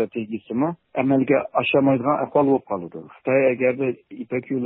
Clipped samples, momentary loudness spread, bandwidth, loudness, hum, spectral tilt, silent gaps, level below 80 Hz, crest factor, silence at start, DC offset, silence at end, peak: under 0.1%; 12 LU; 4 kHz; -22 LUFS; none; -11.5 dB/octave; none; -62 dBFS; 14 dB; 0 s; under 0.1%; 0 s; -6 dBFS